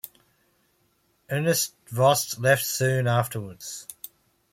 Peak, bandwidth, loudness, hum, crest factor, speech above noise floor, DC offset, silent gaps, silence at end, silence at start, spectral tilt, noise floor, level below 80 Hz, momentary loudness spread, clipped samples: -6 dBFS; 16.5 kHz; -24 LUFS; none; 20 dB; 44 dB; under 0.1%; none; 0.6 s; 1.3 s; -4 dB/octave; -68 dBFS; -66 dBFS; 19 LU; under 0.1%